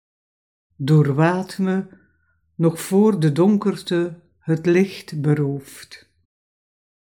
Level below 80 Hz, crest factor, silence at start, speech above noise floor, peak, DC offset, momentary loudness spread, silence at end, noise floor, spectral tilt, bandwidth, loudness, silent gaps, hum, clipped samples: -68 dBFS; 18 dB; 0.8 s; 46 dB; -4 dBFS; under 0.1%; 13 LU; 1.1 s; -65 dBFS; -7.5 dB/octave; 18 kHz; -20 LUFS; none; none; under 0.1%